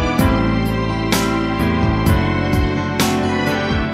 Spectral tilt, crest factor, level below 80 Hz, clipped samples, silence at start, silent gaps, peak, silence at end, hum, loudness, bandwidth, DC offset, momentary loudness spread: -5.5 dB/octave; 16 dB; -26 dBFS; under 0.1%; 0 s; none; -2 dBFS; 0 s; none; -17 LUFS; 16 kHz; under 0.1%; 3 LU